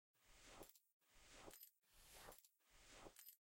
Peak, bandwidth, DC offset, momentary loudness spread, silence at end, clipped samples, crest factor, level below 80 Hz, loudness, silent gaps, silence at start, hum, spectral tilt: -44 dBFS; 16.5 kHz; under 0.1%; 5 LU; 0.05 s; under 0.1%; 22 dB; -76 dBFS; -64 LUFS; 0.92-1.00 s; 0.15 s; none; -2 dB/octave